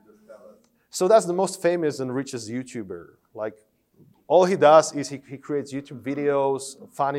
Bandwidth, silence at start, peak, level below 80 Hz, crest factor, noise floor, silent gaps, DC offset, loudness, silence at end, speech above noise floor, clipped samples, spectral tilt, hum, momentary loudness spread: 15 kHz; 0.3 s; -2 dBFS; -74 dBFS; 20 dB; -58 dBFS; none; under 0.1%; -22 LUFS; 0 s; 35 dB; under 0.1%; -5 dB/octave; none; 18 LU